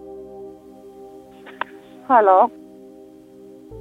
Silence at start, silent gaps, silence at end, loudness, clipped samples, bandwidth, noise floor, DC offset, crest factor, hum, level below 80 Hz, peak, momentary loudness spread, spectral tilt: 0.05 s; none; 0 s; -18 LUFS; under 0.1%; 4.9 kHz; -44 dBFS; under 0.1%; 20 dB; none; -62 dBFS; -2 dBFS; 28 LU; -6.5 dB/octave